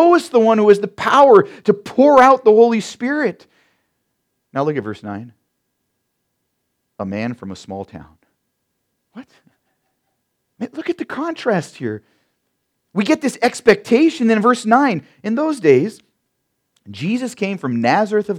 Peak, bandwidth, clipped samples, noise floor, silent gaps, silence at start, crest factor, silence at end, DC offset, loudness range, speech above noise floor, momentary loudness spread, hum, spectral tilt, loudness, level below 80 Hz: 0 dBFS; 13 kHz; under 0.1%; -72 dBFS; none; 0 s; 18 dB; 0 s; under 0.1%; 18 LU; 57 dB; 19 LU; none; -6 dB/octave; -15 LUFS; -62 dBFS